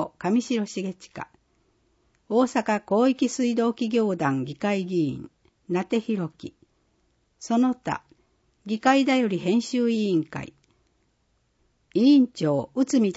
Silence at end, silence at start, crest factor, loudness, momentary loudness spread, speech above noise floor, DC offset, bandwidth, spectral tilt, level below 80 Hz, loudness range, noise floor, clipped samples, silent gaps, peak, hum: 0 s; 0 s; 18 dB; -24 LUFS; 17 LU; 46 dB; under 0.1%; 8 kHz; -5.5 dB/octave; -66 dBFS; 5 LU; -69 dBFS; under 0.1%; none; -6 dBFS; none